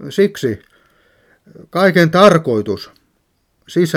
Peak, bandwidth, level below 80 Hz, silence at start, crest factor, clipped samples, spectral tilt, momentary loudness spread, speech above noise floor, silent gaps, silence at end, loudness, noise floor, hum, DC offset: 0 dBFS; 16.5 kHz; -54 dBFS; 0 s; 16 dB; under 0.1%; -6 dB/octave; 16 LU; 50 dB; none; 0 s; -14 LUFS; -63 dBFS; none; under 0.1%